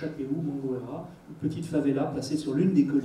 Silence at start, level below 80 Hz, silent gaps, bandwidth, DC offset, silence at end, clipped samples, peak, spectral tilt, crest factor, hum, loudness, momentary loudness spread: 0 s; -62 dBFS; none; 11.5 kHz; under 0.1%; 0 s; under 0.1%; -10 dBFS; -7.5 dB/octave; 18 dB; none; -29 LUFS; 13 LU